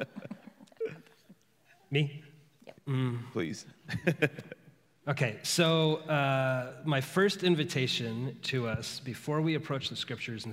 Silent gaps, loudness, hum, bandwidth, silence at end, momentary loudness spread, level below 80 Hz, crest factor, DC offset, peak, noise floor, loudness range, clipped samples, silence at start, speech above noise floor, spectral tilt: none; -32 LUFS; none; 16 kHz; 0 s; 17 LU; -70 dBFS; 22 dB; under 0.1%; -12 dBFS; -66 dBFS; 8 LU; under 0.1%; 0 s; 35 dB; -5 dB/octave